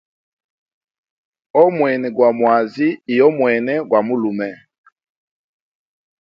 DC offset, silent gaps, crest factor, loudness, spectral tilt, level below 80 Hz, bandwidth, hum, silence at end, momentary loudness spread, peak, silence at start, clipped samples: under 0.1%; none; 18 dB; -16 LUFS; -8.5 dB/octave; -68 dBFS; 5.8 kHz; none; 1.65 s; 7 LU; 0 dBFS; 1.55 s; under 0.1%